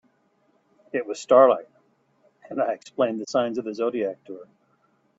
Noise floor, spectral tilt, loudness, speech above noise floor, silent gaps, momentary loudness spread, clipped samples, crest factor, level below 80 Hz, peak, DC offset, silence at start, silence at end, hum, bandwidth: -66 dBFS; -5 dB/octave; -23 LUFS; 43 dB; none; 18 LU; under 0.1%; 24 dB; -74 dBFS; -2 dBFS; under 0.1%; 0.95 s; 0.75 s; none; 8 kHz